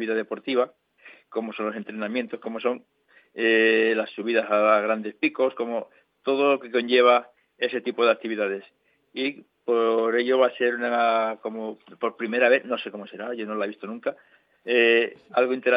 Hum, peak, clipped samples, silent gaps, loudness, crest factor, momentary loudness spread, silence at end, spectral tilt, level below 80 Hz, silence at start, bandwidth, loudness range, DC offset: none; -6 dBFS; under 0.1%; none; -24 LUFS; 20 dB; 13 LU; 0 s; -7.5 dB/octave; -88 dBFS; 0 s; 5.2 kHz; 4 LU; under 0.1%